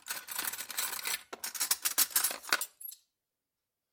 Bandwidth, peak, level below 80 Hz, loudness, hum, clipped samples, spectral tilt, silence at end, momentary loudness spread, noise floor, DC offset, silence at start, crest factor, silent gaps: 17 kHz; -10 dBFS; -82 dBFS; -32 LUFS; none; under 0.1%; 2.5 dB/octave; 1 s; 12 LU; -89 dBFS; under 0.1%; 0.05 s; 26 dB; none